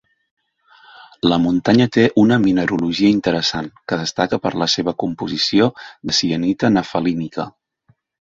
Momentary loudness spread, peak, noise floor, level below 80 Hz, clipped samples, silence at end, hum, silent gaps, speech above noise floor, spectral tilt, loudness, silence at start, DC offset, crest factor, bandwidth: 10 LU; -2 dBFS; -60 dBFS; -50 dBFS; under 0.1%; 0.85 s; none; none; 43 dB; -5 dB/octave; -17 LUFS; 1.25 s; under 0.1%; 16 dB; 7.8 kHz